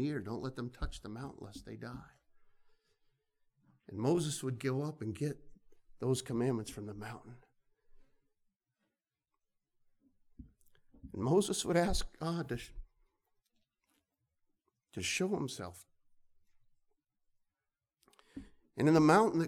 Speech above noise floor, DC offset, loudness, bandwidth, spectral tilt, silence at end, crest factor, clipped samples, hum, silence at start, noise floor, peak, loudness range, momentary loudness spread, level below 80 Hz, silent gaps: over 56 dB; under 0.1%; -35 LUFS; 17.5 kHz; -5.5 dB/octave; 0 s; 24 dB; under 0.1%; none; 0 s; under -90 dBFS; -14 dBFS; 12 LU; 19 LU; -54 dBFS; none